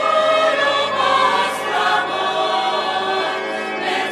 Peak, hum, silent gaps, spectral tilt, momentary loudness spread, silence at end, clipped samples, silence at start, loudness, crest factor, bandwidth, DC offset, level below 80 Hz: -2 dBFS; none; none; -2 dB/octave; 6 LU; 0 s; under 0.1%; 0 s; -18 LUFS; 16 dB; 14 kHz; under 0.1%; -70 dBFS